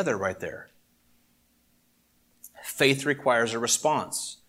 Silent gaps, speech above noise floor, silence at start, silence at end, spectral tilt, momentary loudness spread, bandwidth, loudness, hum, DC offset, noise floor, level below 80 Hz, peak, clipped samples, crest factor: none; 40 dB; 0 s; 0.15 s; -3 dB/octave; 15 LU; 16.5 kHz; -25 LUFS; 60 Hz at -70 dBFS; under 0.1%; -67 dBFS; -68 dBFS; -6 dBFS; under 0.1%; 22 dB